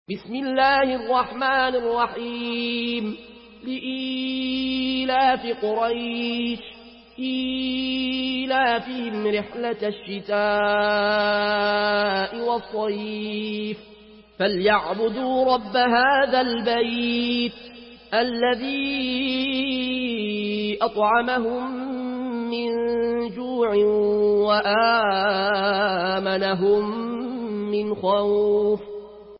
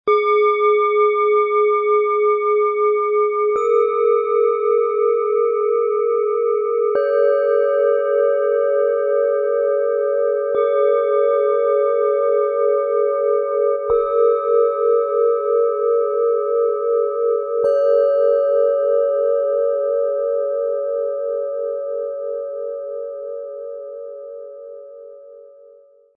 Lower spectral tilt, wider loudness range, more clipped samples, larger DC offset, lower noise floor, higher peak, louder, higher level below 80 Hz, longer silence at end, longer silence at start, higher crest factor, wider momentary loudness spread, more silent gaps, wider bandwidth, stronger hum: first, -9 dB/octave vs -5 dB/octave; second, 4 LU vs 8 LU; neither; neither; about the same, -48 dBFS vs -48 dBFS; about the same, -8 dBFS vs -6 dBFS; second, -23 LUFS vs -18 LUFS; first, -56 dBFS vs -64 dBFS; second, 0 s vs 0.7 s; about the same, 0.1 s vs 0.05 s; about the same, 16 dB vs 12 dB; about the same, 9 LU vs 10 LU; neither; first, 5.8 kHz vs 4.7 kHz; neither